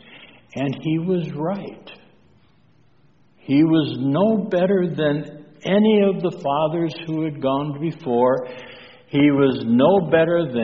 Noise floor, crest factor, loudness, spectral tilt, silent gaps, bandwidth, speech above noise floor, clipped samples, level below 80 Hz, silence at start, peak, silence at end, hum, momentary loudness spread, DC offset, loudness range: -58 dBFS; 16 dB; -20 LUFS; -6 dB/octave; none; 6.8 kHz; 39 dB; under 0.1%; -60 dBFS; 0.1 s; -4 dBFS; 0 s; none; 11 LU; 0.1%; 5 LU